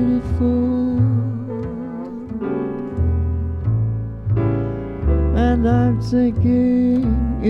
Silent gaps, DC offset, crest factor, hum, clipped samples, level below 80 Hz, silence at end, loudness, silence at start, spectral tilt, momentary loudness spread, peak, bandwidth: none; under 0.1%; 12 dB; none; under 0.1%; -26 dBFS; 0 s; -19 LUFS; 0 s; -10 dB/octave; 11 LU; -6 dBFS; 6.2 kHz